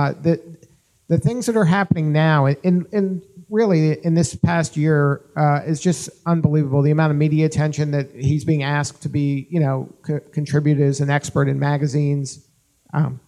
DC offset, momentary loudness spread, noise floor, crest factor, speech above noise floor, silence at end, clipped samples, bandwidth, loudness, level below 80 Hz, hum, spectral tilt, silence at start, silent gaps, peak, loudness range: under 0.1%; 7 LU; -54 dBFS; 18 dB; 35 dB; 0.1 s; under 0.1%; 11.5 kHz; -19 LUFS; -52 dBFS; none; -7 dB/octave; 0 s; none; -2 dBFS; 2 LU